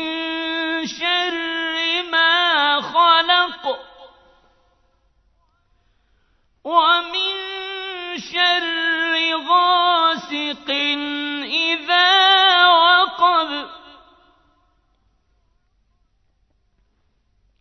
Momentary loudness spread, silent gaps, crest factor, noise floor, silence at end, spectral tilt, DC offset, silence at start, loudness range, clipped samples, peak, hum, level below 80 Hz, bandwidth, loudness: 15 LU; none; 20 dB; -64 dBFS; 3.7 s; -1.5 dB/octave; under 0.1%; 0 s; 9 LU; under 0.1%; 0 dBFS; none; -64 dBFS; 6.4 kHz; -17 LUFS